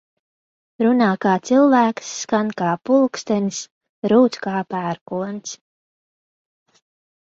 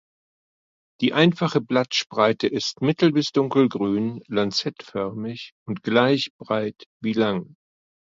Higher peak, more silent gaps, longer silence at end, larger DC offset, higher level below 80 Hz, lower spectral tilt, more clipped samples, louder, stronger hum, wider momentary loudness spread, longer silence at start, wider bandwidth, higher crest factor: about the same, -4 dBFS vs -4 dBFS; second, 3.71-3.81 s, 3.89-4.02 s, 5.01-5.06 s vs 5.52-5.66 s, 6.30-6.39 s, 6.86-7.00 s; first, 1.7 s vs 0.7 s; neither; about the same, -66 dBFS vs -64 dBFS; about the same, -5.5 dB/octave vs -5.5 dB/octave; neither; first, -19 LUFS vs -22 LUFS; neither; about the same, 13 LU vs 12 LU; second, 0.8 s vs 1 s; about the same, 7.8 kHz vs 7.6 kHz; about the same, 18 dB vs 20 dB